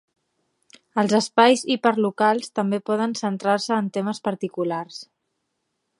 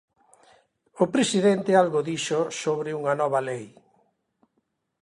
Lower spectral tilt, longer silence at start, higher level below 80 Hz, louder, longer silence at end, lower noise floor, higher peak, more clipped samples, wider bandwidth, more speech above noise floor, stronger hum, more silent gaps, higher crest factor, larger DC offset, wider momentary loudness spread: about the same, -4.5 dB/octave vs -4.5 dB/octave; about the same, 0.95 s vs 0.95 s; about the same, -74 dBFS vs -70 dBFS; about the same, -22 LUFS vs -24 LUFS; second, 0.95 s vs 1.35 s; about the same, -76 dBFS vs -75 dBFS; first, -2 dBFS vs -6 dBFS; neither; about the same, 11.5 kHz vs 11.5 kHz; first, 55 dB vs 51 dB; neither; neither; about the same, 22 dB vs 20 dB; neither; first, 10 LU vs 7 LU